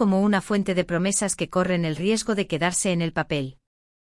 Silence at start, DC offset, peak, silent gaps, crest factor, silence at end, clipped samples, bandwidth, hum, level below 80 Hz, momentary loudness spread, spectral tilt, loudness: 0 s; under 0.1%; -8 dBFS; none; 16 dB; 0.6 s; under 0.1%; 12 kHz; none; -52 dBFS; 4 LU; -4.5 dB/octave; -23 LUFS